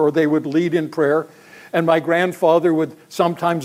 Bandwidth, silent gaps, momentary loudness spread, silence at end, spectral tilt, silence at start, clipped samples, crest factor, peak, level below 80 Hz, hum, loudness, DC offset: 15.5 kHz; none; 6 LU; 0 s; -6.5 dB/octave; 0 s; under 0.1%; 16 dB; -2 dBFS; -70 dBFS; none; -18 LUFS; under 0.1%